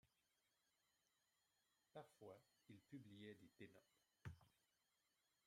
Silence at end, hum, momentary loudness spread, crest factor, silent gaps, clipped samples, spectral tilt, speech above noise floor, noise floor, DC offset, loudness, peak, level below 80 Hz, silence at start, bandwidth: 0.85 s; none; 4 LU; 22 dB; none; under 0.1%; -6 dB/octave; 25 dB; -89 dBFS; under 0.1%; -64 LUFS; -44 dBFS; -88 dBFS; 0.05 s; 14.5 kHz